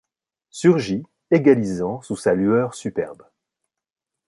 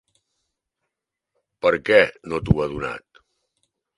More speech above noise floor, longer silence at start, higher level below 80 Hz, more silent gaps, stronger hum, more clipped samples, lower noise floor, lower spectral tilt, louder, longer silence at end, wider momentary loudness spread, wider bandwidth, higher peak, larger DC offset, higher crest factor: about the same, 62 dB vs 63 dB; second, 0.55 s vs 1.65 s; second, -56 dBFS vs -42 dBFS; neither; neither; neither; about the same, -81 dBFS vs -83 dBFS; about the same, -7 dB/octave vs -7 dB/octave; about the same, -20 LUFS vs -21 LUFS; first, 1.15 s vs 1 s; about the same, 12 LU vs 14 LU; about the same, 11.5 kHz vs 11.5 kHz; about the same, -2 dBFS vs 0 dBFS; neither; about the same, 20 dB vs 24 dB